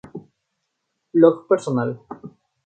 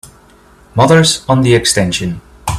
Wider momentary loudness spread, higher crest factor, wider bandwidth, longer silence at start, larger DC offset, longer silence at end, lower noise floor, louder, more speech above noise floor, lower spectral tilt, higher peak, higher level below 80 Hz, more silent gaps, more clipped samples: first, 24 LU vs 14 LU; first, 20 dB vs 12 dB; second, 9 kHz vs 14.5 kHz; about the same, 0.15 s vs 0.05 s; neither; first, 0.35 s vs 0 s; first, -76 dBFS vs -44 dBFS; second, -19 LUFS vs -11 LUFS; first, 58 dB vs 33 dB; first, -8 dB/octave vs -4.5 dB/octave; about the same, -2 dBFS vs 0 dBFS; second, -68 dBFS vs -38 dBFS; neither; neither